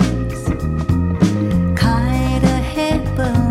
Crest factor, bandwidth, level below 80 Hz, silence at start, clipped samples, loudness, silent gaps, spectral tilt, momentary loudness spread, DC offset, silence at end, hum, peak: 16 dB; 15 kHz; -24 dBFS; 0 s; under 0.1%; -17 LUFS; none; -7 dB/octave; 5 LU; under 0.1%; 0 s; none; 0 dBFS